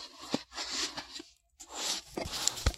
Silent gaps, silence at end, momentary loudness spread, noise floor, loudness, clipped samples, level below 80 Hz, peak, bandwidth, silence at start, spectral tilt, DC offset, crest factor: none; 0 s; 14 LU; -56 dBFS; -35 LUFS; under 0.1%; -46 dBFS; -6 dBFS; 16 kHz; 0 s; -2 dB/octave; under 0.1%; 32 dB